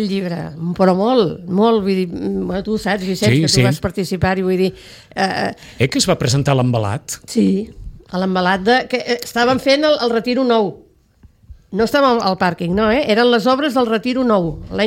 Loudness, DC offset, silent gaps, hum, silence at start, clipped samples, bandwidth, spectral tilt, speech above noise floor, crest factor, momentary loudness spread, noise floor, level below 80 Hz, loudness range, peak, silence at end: -16 LUFS; under 0.1%; none; none; 0 s; under 0.1%; 16.5 kHz; -5.5 dB/octave; 33 dB; 14 dB; 8 LU; -49 dBFS; -42 dBFS; 2 LU; -2 dBFS; 0 s